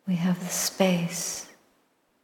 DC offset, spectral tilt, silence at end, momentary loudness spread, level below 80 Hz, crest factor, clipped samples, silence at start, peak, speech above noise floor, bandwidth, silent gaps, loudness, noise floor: under 0.1%; -4.5 dB/octave; 0.75 s; 11 LU; -70 dBFS; 20 dB; under 0.1%; 0.05 s; -8 dBFS; 42 dB; 18.5 kHz; none; -27 LUFS; -68 dBFS